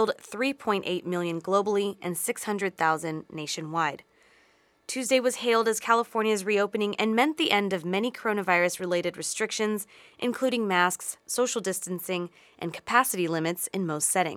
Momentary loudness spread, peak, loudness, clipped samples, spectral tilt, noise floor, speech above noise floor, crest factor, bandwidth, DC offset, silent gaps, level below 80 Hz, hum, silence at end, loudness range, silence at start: 9 LU; -6 dBFS; -27 LUFS; under 0.1%; -3.5 dB/octave; -63 dBFS; 36 dB; 22 dB; 18.5 kHz; under 0.1%; none; -76 dBFS; none; 0 s; 4 LU; 0 s